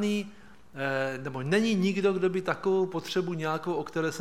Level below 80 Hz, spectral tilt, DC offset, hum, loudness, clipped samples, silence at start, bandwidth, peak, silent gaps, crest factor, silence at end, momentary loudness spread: -66 dBFS; -6 dB/octave; 0.3%; none; -29 LUFS; under 0.1%; 0 s; 15 kHz; -10 dBFS; none; 18 dB; 0 s; 8 LU